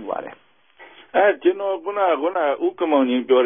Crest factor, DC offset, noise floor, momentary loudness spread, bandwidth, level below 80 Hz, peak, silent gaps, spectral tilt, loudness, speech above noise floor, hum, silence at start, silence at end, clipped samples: 16 dB; 0.1%; -49 dBFS; 10 LU; 3.7 kHz; -72 dBFS; -4 dBFS; none; -8.5 dB/octave; -20 LUFS; 29 dB; none; 0 s; 0 s; under 0.1%